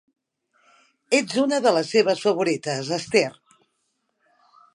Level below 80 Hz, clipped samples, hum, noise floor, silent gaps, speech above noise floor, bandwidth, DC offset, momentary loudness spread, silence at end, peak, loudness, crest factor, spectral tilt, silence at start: -72 dBFS; under 0.1%; none; -74 dBFS; none; 52 dB; 11.5 kHz; under 0.1%; 7 LU; 1.4 s; -4 dBFS; -22 LUFS; 20 dB; -4 dB/octave; 1.1 s